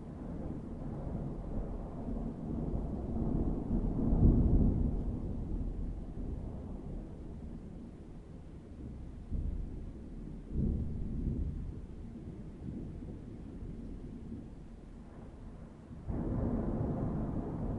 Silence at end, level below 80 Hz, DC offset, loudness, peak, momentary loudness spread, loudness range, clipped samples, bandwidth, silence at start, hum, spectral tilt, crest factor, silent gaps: 0 s; -40 dBFS; under 0.1%; -38 LUFS; -14 dBFS; 16 LU; 13 LU; under 0.1%; 3.7 kHz; 0 s; none; -11 dB/octave; 22 dB; none